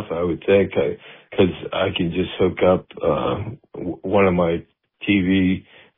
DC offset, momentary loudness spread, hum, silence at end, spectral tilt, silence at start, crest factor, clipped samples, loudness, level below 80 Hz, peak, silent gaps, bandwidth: under 0.1%; 12 LU; none; 0.35 s; -5.5 dB/octave; 0 s; 18 dB; under 0.1%; -21 LUFS; -48 dBFS; -2 dBFS; none; 3.8 kHz